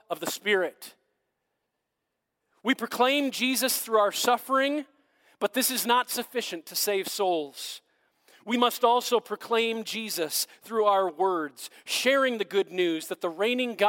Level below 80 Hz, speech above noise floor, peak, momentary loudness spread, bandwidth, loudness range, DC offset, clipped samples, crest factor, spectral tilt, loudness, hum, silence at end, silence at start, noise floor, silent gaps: -84 dBFS; 56 dB; -8 dBFS; 10 LU; 17 kHz; 3 LU; under 0.1%; under 0.1%; 20 dB; -2 dB/octave; -26 LUFS; none; 0 s; 0.1 s; -82 dBFS; none